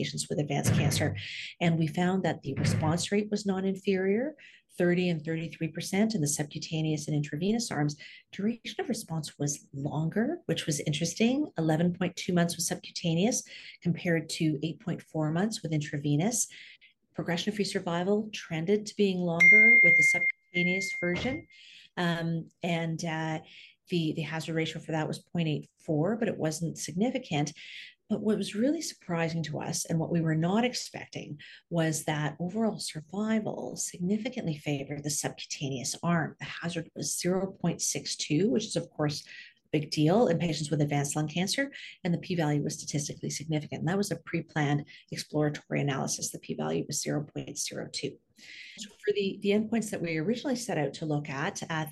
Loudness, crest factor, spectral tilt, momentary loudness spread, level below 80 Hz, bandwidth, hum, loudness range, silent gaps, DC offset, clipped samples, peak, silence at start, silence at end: -29 LUFS; 18 dB; -4.5 dB/octave; 8 LU; -64 dBFS; 12.5 kHz; none; 10 LU; none; under 0.1%; under 0.1%; -12 dBFS; 0 s; 0 s